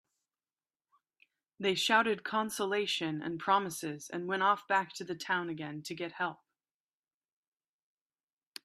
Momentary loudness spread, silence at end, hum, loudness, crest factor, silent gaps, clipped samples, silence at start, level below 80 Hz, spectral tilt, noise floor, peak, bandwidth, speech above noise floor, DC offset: 12 LU; 2.3 s; none; -33 LUFS; 24 dB; none; under 0.1%; 1.6 s; -82 dBFS; -3.5 dB/octave; under -90 dBFS; -12 dBFS; 15 kHz; over 57 dB; under 0.1%